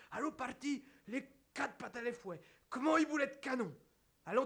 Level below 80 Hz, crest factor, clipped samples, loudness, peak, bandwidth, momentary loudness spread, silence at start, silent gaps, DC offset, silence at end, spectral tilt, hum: -78 dBFS; 20 dB; under 0.1%; -40 LUFS; -20 dBFS; 11 kHz; 16 LU; 0 s; none; under 0.1%; 0 s; -4.5 dB/octave; none